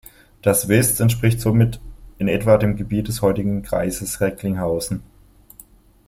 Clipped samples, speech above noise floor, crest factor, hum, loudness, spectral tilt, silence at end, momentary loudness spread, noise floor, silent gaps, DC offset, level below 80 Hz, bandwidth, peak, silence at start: under 0.1%; 31 dB; 18 dB; none; -19 LUFS; -5.5 dB/octave; 1.05 s; 8 LU; -49 dBFS; none; under 0.1%; -40 dBFS; 16.5 kHz; -2 dBFS; 0.45 s